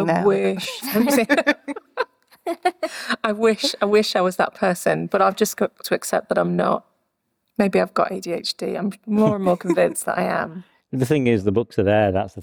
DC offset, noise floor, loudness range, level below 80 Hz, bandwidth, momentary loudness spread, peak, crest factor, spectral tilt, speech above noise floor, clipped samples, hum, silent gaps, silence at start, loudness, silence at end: under 0.1%; -73 dBFS; 2 LU; -58 dBFS; over 20 kHz; 9 LU; -4 dBFS; 16 dB; -5 dB/octave; 53 dB; under 0.1%; none; none; 0 s; -21 LUFS; 0 s